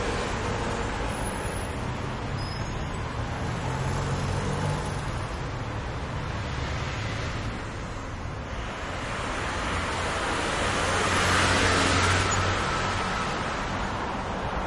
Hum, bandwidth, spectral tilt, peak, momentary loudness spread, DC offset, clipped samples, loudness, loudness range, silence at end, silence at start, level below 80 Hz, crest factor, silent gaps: none; 11.5 kHz; -4 dB/octave; -8 dBFS; 11 LU; under 0.1%; under 0.1%; -28 LUFS; 8 LU; 0 s; 0 s; -38 dBFS; 20 dB; none